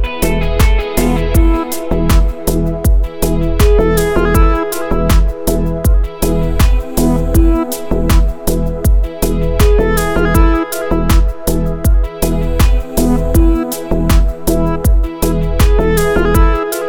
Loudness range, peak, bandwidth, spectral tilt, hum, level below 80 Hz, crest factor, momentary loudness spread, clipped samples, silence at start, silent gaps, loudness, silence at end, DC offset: 1 LU; 0 dBFS; 19.5 kHz; -6 dB/octave; none; -14 dBFS; 10 dB; 5 LU; under 0.1%; 0 s; none; -14 LUFS; 0 s; under 0.1%